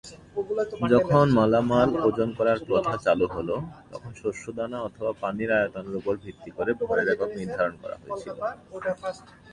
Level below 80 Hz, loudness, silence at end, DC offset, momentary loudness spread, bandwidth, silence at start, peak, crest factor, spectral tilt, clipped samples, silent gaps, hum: -54 dBFS; -26 LUFS; 0.3 s; under 0.1%; 15 LU; 10.5 kHz; 0.05 s; -6 dBFS; 20 dB; -7 dB/octave; under 0.1%; none; none